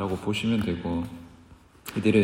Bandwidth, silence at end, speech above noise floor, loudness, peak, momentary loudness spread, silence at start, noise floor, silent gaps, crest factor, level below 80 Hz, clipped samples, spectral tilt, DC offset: 16 kHz; 0 s; 28 dB; -28 LUFS; -8 dBFS; 15 LU; 0 s; -53 dBFS; none; 18 dB; -54 dBFS; under 0.1%; -6.5 dB/octave; under 0.1%